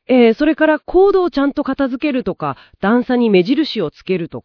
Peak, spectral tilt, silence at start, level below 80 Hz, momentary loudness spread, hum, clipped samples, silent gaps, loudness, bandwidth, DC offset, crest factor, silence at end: 0 dBFS; -8 dB/octave; 0.1 s; -44 dBFS; 9 LU; none; under 0.1%; none; -15 LUFS; 5.4 kHz; under 0.1%; 14 dB; 0.05 s